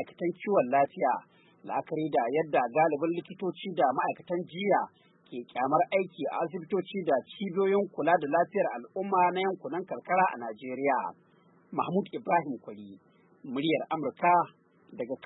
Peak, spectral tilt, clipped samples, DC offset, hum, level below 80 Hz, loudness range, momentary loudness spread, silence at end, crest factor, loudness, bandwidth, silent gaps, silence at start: -12 dBFS; -10 dB/octave; under 0.1%; under 0.1%; none; -82 dBFS; 3 LU; 12 LU; 0.1 s; 18 dB; -29 LUFS; 4.1 kHz; none; 0 s